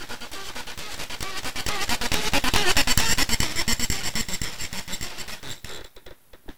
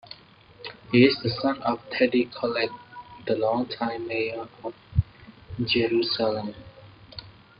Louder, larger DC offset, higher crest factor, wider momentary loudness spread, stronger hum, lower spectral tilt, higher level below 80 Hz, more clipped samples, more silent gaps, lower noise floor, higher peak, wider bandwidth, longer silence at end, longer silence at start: about the same, -25 LUFS vs -25 LUFS; first, 3% vs under 0.1%; about the same, 26 dB vs 22 dB; second, 15 LU vs 21 LU; neither; second, -2 dB/octave vs -9 dB/octave; first, -38 dBFS vs -48 dBFS; neither; neither; second, -47 dBFS vs -52 dBFS; first, 0 dBFS vs -6 dBFS; first, 19 kHz vs 5.4 kHz; second, 0 s vs 0.3 s; about the same, 0 s vs 0.1 s